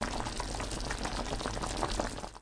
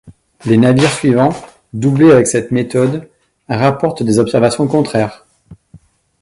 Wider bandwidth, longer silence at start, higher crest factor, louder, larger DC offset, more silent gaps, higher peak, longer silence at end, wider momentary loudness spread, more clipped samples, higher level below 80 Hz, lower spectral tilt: about the same, 10.5 kHz vs 11.5 kHz; about the same, 0 s vs 0.05 s; first, 20 dB vs 14 dB; second, -36 LUFS vs -13 LUFS; neither; neither; second, -16 dBFS vs 0 dBFS; second, 0 s vs 0.45 s; second, 3 LU vs 13 LU; neither; first, -42 dBFS vs -48 dBFS; second, -3.5 dB/octave vs -6 dB/octave